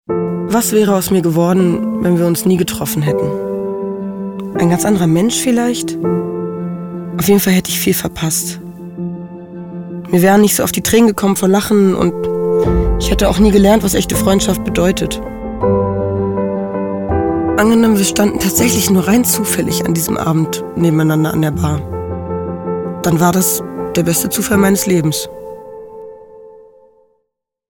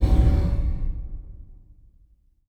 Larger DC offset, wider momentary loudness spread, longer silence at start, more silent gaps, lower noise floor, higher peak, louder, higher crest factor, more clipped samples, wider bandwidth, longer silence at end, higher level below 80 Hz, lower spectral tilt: neither; second, 12 LU vs 22 LU; about the same, 0.1 s vs 0 s; neither; first, -71 dBFS vs -58 dBFS; first, 0 dBFS vs -8 dBFS; first, -14 LUFS vs -25 LUFS; about the same, 14 dB vs 16 dB; neither; first, 19.5 kHz vs 5.6 kHz; first, 1.15 s vs 0.95 s; second, -30 dBFS vs -24 dBFS; second, -5 dB/octave vs -9 dB/octave